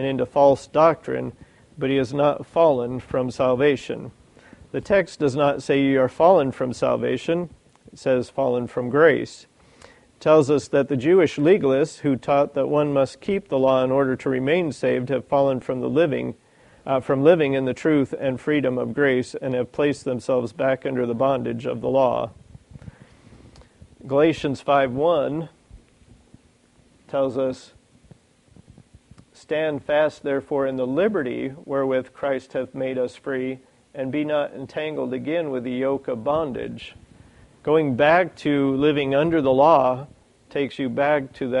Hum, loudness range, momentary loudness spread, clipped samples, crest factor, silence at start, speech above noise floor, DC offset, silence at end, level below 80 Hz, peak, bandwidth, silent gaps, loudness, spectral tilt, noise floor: none; 7 LU; 11 LU; under 0.1%; 18 dB; 0 s; 36 dB; under 0.1%; 0 s; -56 dBFS; -4 dBFS; 11 kHz; none; -22 LUFS; -7 dB/octave; -57 dBFS